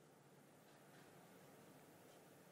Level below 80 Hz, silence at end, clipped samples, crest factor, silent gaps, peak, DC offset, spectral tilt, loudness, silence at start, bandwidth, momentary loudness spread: under -90 dBFS; 0 s; under 0.1%; 14 dB; none; -52 dBFS; under 0.1%; -4.5 dB/octave; -65 LUFS; 0 s; 16 kHz; 3 LU